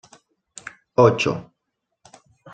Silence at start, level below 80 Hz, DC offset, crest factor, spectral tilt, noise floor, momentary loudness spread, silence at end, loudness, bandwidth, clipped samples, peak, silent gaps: 1 s; -58 dBFS; under 0.1%; 22 dB; -6 dB/octave; -78 dBFS; 23 LU; 1.1 s; -19 LUFS; 9.2 kHz; under 0.1%; -2 dBFS; none